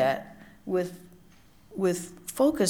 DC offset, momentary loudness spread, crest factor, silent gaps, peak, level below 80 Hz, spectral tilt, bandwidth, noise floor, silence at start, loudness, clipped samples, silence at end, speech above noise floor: under 0.1%; 19 LU; 18 dB; none; -12 dBFS; -62 dBFS; -5 dB/octave; 19.5 kHz; -55 dBFS; 0 s; -30 LUFS; under 0.1%; 0 s; 28 dB